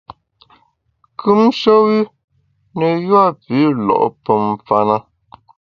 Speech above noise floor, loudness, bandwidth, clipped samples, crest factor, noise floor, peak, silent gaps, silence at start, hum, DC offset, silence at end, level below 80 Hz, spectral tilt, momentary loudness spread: 47 dB; -15 LUFS; 6.8 kHz; under 0.1%; 16 dB; -61 dBFS; 0 dBFS; 2.24-2.28 s; 1.2 s; none; under 0.1%; 0.75 s; -58 dBFS; -8 dB/octave; 9 LU